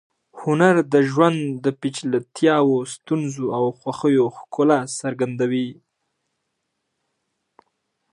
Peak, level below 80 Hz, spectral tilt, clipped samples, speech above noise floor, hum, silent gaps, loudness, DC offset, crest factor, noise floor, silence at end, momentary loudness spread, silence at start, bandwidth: -2 dBFS; -72 dBFS; -6 dB/octave; under 0.1%; 56 dB; none; none; -20 LUFS; under 0.1%; 20 dB; -76 dBFS; 2.4 s; 9 LU; 0.35 s; 11 kHz